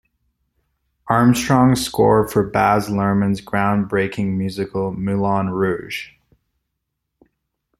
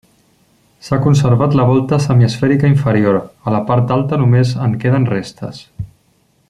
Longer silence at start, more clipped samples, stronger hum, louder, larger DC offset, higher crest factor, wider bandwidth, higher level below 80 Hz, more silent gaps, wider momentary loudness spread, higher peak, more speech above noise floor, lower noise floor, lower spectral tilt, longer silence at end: first, 1.05 s vs 0.85 s; neither; neither; second, -18 LUFS vs -14 LUFS; neither; about the same, 18 dB vs 14 dB; first, 15.5 kHz vs 10.5 kHz; about the same, -48 dBFS vs -46 dBFS; neither; second, 9 LU vs 17 LU; about the same, -2 dBFS vs 0 dBFS; first, 59 dB vs 44 dB; first, -77 dBFS vs -57 dBFS; second, -6 dB/octave vs -8 dB/octave; first, 1.75 s vs 0.65 s